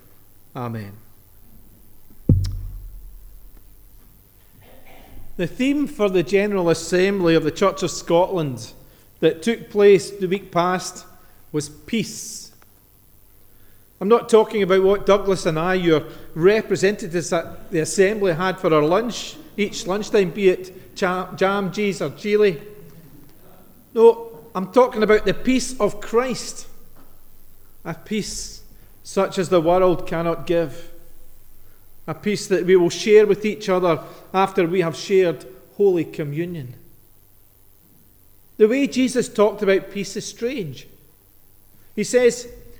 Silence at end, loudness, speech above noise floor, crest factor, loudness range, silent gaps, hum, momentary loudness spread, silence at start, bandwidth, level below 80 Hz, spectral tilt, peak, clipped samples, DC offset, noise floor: 0 s; -20 LUFS; 32 dB; 20 dB; 9 LU; none; none; 16 LU; 0.55 s; over 20 kHz; -42 dBFS; -5.5 dB/octave; -2 dBFS; under 0.1%; under 0.1%; -52 dBFS